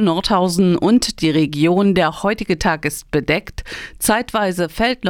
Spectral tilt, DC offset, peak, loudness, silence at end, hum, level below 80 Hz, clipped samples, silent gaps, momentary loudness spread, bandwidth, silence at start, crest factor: -5 dB/octave; under 0.1%; -2 dBFS; -17 LUFS; 0 s; none; -38 dBFS; under 0.1%; none; 7 LU; 18 kHz; 0 s; 16 dB